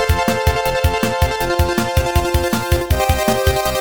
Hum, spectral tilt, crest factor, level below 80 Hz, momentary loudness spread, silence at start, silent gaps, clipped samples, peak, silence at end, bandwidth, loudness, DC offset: none; -5 dB/octave; 14 dB; -22 dBFS; 2 LU; 0 s; none; under 0.1%; -2 dBFS; 0 s; over 20 kHz; -17 LUFS; 1%